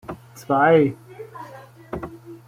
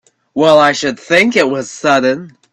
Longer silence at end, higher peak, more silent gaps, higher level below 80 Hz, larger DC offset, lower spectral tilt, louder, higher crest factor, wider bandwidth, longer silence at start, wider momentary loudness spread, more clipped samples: second, 0.1 s vs 0.25 s; second, -4 dBFS vs 0 dBFS; neither; about the same, -54 dBFS vs -56 dBFS; neither; first, -7.5 dB/octave vs -4 dB/octave; second, -18 LUFS vs -12 LUFS; first, 18 dB vs 12 dB; first, 15.5 kHz vs 12.5 kHz; second, 0.1 s vs 0.35 s; first, 23 LU vs 9 LU; neither